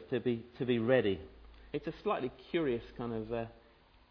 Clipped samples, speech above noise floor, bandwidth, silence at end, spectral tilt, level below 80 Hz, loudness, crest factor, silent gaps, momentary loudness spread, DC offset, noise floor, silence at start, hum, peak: under 0.1%; 29 dB; 5.4 kHz; 0.6 s; -5.5 dB/octave; -60 dBFS; -35 LUFS; 20 dB; none; 12 LU; under 0.1%; -63 dBFS; 0 s; none; -16 dBFS